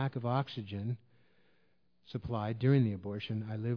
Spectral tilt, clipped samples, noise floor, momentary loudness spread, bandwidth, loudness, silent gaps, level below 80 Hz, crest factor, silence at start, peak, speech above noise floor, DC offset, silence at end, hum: -10 dB/octave; under 0.1%; -75 dBFS; 13 LU; 5.4 kHz; -35 LUFS; none; -64 dBFS; 18 dB; 0 s; -16 dBFS; 42 dB; under 0.1%; 0 s; none